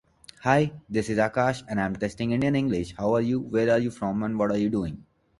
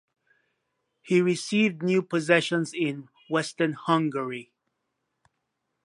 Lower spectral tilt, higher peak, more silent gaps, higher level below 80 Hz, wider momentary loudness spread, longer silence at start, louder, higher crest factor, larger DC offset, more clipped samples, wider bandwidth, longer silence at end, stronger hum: first, -7 dB/octave vs -5.5 dB/octave; about the same, -6 dBFS vs -4 dBFS; neither; first, -52 dBFS vs -78 dBFS; second, 6 LU vs 9 LU; second, 0.4 s vs 1.05 s; about the same, -26 LUFS vs -25 LUFS; about the same, 20 dB vs 24 dB; neither; neither; about the same, 11.5 kHz vs 11.5 kHz; second, 0.4 s vs 1.4 s; neither